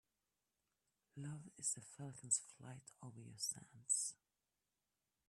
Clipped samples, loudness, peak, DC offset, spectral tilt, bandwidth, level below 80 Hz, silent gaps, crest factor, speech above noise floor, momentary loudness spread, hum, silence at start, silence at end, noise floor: under 0.1%; -43 LUFS; -24 dBFS; under 0.1%; -2 dB/octave; 14 kHz; -88 dBFS; none; 26 dB; over 43 dB; 18 LU; none; 1.15 s; 1.15 s; under -90 dBFS